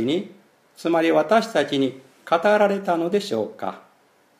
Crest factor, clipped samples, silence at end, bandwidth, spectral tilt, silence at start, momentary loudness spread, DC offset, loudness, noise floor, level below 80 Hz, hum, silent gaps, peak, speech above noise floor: 18 dB; under 0.1%; 0.6 s; 15 kHz; -5.5 dB/octave; 0 s; 12 LU; under 0.1%; -21 LUFS; -59 dBFS; -72 dBFS; none; none; -4 dBFS; 38 dB